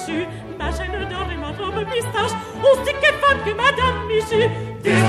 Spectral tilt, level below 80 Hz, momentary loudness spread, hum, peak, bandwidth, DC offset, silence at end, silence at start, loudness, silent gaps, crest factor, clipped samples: -5 dB/octave; -36 dBFS; 10 LU; none; -4 dBFS; 14 kHz; under 0.1%; 0 s; 0 s; -20 LUFS; none; 16 dB; under 0.1%